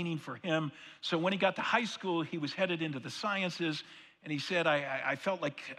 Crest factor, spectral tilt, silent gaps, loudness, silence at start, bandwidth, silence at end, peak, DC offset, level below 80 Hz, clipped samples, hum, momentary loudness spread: 20 dB; -5 dB/octave; none; -34 LUFS; 0 s; 13 kHz; 0 s; -14 dBFS; under 0.1%; -84 dBFS; under 0.1%; none; 10 LU